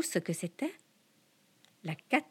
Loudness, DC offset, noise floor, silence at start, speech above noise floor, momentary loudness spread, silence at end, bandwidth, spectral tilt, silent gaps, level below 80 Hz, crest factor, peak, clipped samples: -36 LUFS; under 0.1%; -69 dBFS; 0 s; 34 dB; 13 LU; 0.05 s; 17.5 kHz; -4.5 dB/octave; none; -90 dBFS; 24 dB; -12 dBFS; under 0.1%